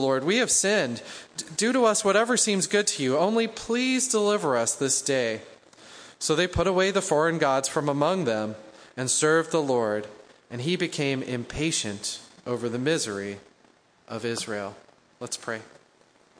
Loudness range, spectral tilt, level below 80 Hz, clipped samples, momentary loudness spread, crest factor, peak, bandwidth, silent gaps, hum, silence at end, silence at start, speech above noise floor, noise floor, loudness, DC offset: 8 LU; -3 dB/octave; -54 dBFS; under 0.1%; 15 LU; 18 dB; -8 dBFS; 10.5 kHz; none; none; 0.75 s; 0 s; 35 dB; -60 dBFS; -25 LUFS; under 0.1%